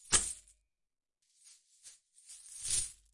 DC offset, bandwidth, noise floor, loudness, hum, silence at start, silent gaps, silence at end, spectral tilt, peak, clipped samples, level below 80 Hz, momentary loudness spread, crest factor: under 0.1%; 11.5 kHz; -88 dBFS; -33 LUFS; none; 0.05 s; none; 0.2 s; 0.5 dB/octave; -12 dBFS; under 0.1%; -58 dBFS; 26 LU; 28 dB